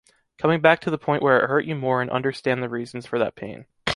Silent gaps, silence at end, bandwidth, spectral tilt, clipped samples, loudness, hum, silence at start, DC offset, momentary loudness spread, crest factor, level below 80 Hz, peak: none; 0 s; 11.5 kHz; -6.5 dB/octave; under 0.1%; -22 LUFS; none; 0.4 s; under 0.1%; 11 LU; 20 dB; -58 dBFS; -2 dBFS